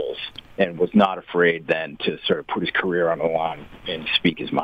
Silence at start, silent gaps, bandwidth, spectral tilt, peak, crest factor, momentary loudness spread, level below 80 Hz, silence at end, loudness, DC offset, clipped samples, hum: 0 s; none; 5.8 kHz; -7 dB/octave; -6 dBFS; 18 dB; 10 LU; -54 dBFS; 0 s; -22 LUFS; under 0.1%; under 0.1%; none